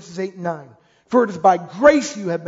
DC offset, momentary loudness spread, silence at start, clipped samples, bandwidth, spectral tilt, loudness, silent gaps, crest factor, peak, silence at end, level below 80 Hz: under 0.1%; 14 LU; 0.05 s; under 0.1%; 7.8 kHz; -5 dB/octave; -18 LUFS; none; 18 dB; -2 dBFS; 0 s; -56 dBFS